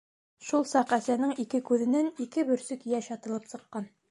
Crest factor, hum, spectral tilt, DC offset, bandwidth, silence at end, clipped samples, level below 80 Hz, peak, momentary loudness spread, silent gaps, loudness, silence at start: 18 dB; none; -4.5 dB/octave; under 0.1%; 11.5 kHz; 0.25 s; under 0.1%; -78 dBFS; -12 dBFS; 13 LU; none; -29 LUFS; 0.4 s